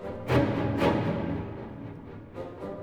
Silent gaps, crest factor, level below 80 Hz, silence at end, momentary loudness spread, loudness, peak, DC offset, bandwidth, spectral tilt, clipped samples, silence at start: none; 20 dB; -48 dBFS; 0 s; 16 LU; -28 LUFS; -10 dBFS; under 0.1%; 15.5 kHz; -8 dB/octave; under 0.1%; 0 s